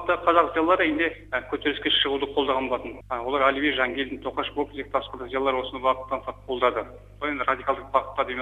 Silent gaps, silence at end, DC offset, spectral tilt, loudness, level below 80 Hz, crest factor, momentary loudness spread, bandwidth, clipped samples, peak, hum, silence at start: none; 0 s; under 0.1%; -5.5 dB/octave; -25 LUFS; -50 dBFS; 22 dB; 10 LU; 9.8 kHz; under 0.1%; -4 dBFS; 50 Hz at -50 dBFS; 0 s